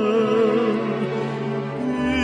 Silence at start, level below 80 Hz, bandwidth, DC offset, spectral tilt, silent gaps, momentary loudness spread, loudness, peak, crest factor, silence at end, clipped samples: 0 s; -46 dBFS; 10 kHz; under 0.1%; -7 dB/octave; none; 7 LU; -22 LUFS; -8 dBFS; 12 dB; 0 s; under 0.1%